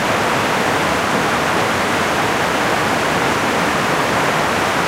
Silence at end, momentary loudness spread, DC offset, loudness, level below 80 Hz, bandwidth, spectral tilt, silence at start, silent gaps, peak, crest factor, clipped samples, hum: 0 s; 1 LU; under 0.1%; -16 LUFS; -42 dBFS; 16 kHz; -3.5 dB/octave; 0 s; none; -4 dBFS; 14 dB; under 0.1%; none